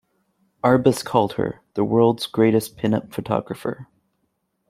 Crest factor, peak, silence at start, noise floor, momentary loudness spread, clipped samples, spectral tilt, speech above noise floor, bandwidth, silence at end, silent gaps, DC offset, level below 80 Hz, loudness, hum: 20 dB; -2 dBFS; 0.65 s; -72 dBFS; 11 LU; under 0.1%; -6.5 dB/octave; 52 dB; 16 kHz; 0.85 s; none; under 0.1%; -56 dBFS; -21 LUFS; none